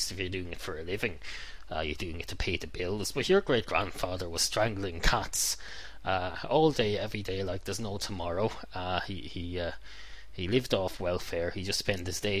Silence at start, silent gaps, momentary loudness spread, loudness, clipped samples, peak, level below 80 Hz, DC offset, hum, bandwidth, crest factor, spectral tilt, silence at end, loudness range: 0 s; none; 12 LU; -32 LUFS; under 0.1%; -10 dBFS; -44 dBFS; 0.8%; none; 16 kHz; 22 dB; -3.5 dB/octave; 0 s; 5 LU